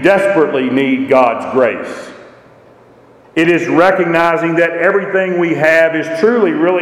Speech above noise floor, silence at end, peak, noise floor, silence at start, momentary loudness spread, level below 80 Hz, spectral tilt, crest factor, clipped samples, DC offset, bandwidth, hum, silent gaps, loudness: 31 dB; 0 s; 0 dBFS; -43 dBFS; 0 s; 5 LU; -56 dBFS; -6 dB/octave; 12 dB; under 0.1%; under 0.1%; 13.5 kHz; none; none; -12 LUFS